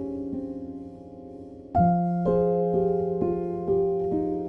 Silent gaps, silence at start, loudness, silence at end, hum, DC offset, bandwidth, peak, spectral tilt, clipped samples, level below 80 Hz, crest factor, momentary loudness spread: none; 0 s; -25 LUFS; 0 s; none; under 0.1%; 3.4 kHz; -12 dBFS; -12 dB/octave; under 0.1%; -50 dBFS; 14 dB; 20 LU